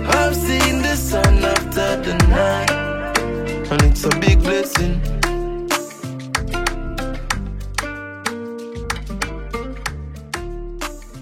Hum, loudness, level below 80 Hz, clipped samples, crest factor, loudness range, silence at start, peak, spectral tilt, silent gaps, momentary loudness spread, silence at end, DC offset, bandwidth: none; -20 LUFS; -24 dBFS; under 0.1%; 18 dB; 9 LU; 0 s; 0 dBFS; -4.5 dB/octave; none; 14 LU; 0 s; under 0.1%; 16.5 kHz